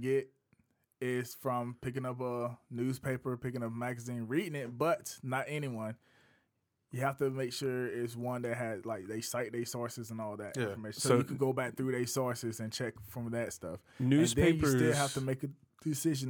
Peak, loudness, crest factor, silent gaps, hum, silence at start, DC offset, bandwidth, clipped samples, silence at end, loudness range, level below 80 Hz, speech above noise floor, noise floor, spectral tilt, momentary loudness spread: -14 dBFS; -35 LUFS; 20 dB; none; none; 0 s; under 0.1%; over 20 kHz; under 0.1%; 0 s; 6 LU; -60 dBFS; 46 dB; -80 dBFS; -5.5 dB/octave; 12 LU